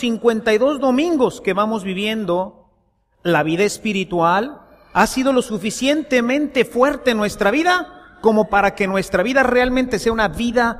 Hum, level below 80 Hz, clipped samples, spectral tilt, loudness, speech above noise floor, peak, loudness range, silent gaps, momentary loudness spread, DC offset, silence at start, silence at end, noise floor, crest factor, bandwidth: none; -42 dBFS; under 0.1%; -4.5 dB/octave; -18 LUFS; 44 dB; 0 dBFS; 3 LU; none; 6 LU; under 0.1%; 0 s; 0 s; -62 dBFS; 18 dB; 15 kHz